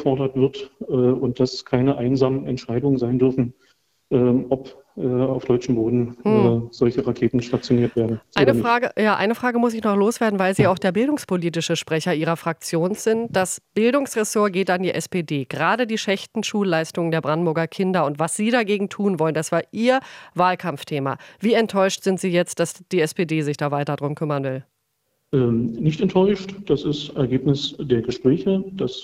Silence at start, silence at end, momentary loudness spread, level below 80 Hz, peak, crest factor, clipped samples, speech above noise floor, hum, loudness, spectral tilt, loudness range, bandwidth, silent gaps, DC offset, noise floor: 0 s; 0 s; 7 LU; -54 dBFS; -2 dBFS; 20 dB; under 0.1%; 51 dB; none; -21 LUFS; -6 dB/octave; 3 LU; 15.5 kHz; none; under 0.1%; -72 dBFS